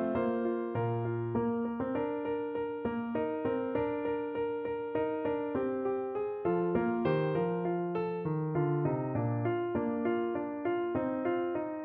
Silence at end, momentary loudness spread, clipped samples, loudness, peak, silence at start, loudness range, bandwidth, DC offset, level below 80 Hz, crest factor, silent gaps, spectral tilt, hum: 0 s; 4 LU; under 0.1%; -33 LUFS; -18 dBFS; 0 s; 2 LU; 4.5 kHz; under 0.1%; -64 dBFS; 14 dB; none; -11.5 dB/octave; none